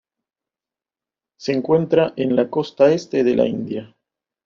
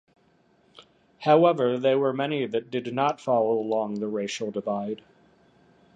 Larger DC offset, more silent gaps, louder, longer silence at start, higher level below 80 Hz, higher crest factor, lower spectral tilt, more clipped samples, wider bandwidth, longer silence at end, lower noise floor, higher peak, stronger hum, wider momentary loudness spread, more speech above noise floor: neither; neither; first, -19 LUFS vs -25 LUFS; first, 1.4 s vs 0.8 s; first, -60 dBFS vs -74 dBFS; about the same, 18 dB vs 20 dB; about the same, -6 dB/octave vs -6 dB/octave; neither; second, 7.4 kHz vs 9.4 kHz; second, 0.6 s vs 1 s; first, -90 dBFS vs -63 dBFS; first, -2 dBFS vs -6 dBFS; neither; about the same, 11 LU vs 11 LU; first, 72 dB vs 39 dB